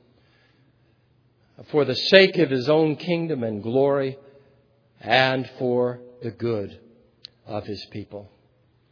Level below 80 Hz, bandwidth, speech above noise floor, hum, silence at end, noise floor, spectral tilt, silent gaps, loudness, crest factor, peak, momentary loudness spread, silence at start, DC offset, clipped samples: -68 dBFS; 5.4 kHz; 40 dB; none; 0.65 s; -62 dBFS; -6.5 dB/octave; none; -21 LUFS; 24 dB; 0 dBFS; 21 LU; 1.6 s; under 0.1%; under 0.1%